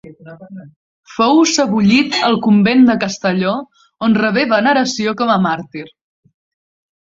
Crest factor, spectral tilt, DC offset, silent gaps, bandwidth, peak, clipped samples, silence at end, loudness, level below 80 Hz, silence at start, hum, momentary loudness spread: 14 dB; -4.5 dB/octave; under 0.1%; 0.76-1.03 s; 7.8 kHz; 0 dBFS; under 0.1%; 1.15 s; -14 LUFS; -54 dBFS; 0.05 s; none; 13 LU